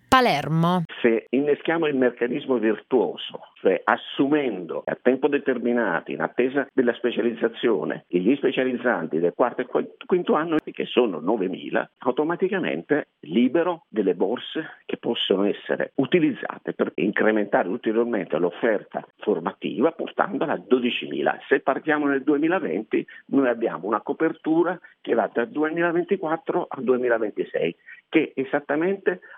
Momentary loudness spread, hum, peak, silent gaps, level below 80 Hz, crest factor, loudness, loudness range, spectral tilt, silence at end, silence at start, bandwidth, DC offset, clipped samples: 6 LU; none; -2 dBFS; none; -66 dBFS; 22 dB; -24 LUFS; 1 LU; -6.5 dB/octave; 0 s; 0.1 s; 12.5 kHz; under 0.1%; under 0.1%